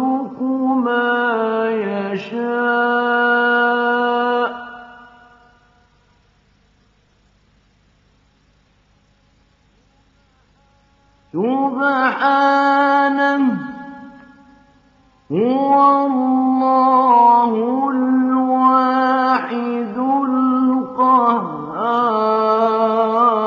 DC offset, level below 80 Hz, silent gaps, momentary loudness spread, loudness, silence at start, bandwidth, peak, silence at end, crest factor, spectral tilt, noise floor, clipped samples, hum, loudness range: under 0.1%; -64 dBFS; none; 9 LU; -16 LUFS; 0 s; 6.4 kHz; -2 dBFS; 0 s; 16 dB; -3 dB/octave; -57 dBFS; under 0.1%; none; 8 LU